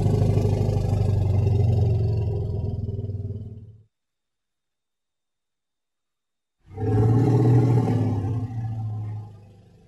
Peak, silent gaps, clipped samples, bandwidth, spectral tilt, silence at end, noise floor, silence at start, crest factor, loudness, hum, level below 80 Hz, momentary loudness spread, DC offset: -8 dBFS; none; under 0.1%; 8 kHz; -9.5 dB/octave; 0.5 s; -88 dBFS; 0 s; 14 dB; -23 LUFS; none; -40 dBFS; 15 LU; under 0.1%